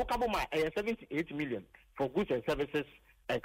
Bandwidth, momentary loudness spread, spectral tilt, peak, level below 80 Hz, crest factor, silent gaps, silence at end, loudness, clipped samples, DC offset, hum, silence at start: 16 kHz; 10 LU; -5.5 dB/octave; -22 dBFS; -54 dBFS; 12 dB; none; 0.05 s; -35 LUFS; under 0.1%; under 0.1%; none; 0 s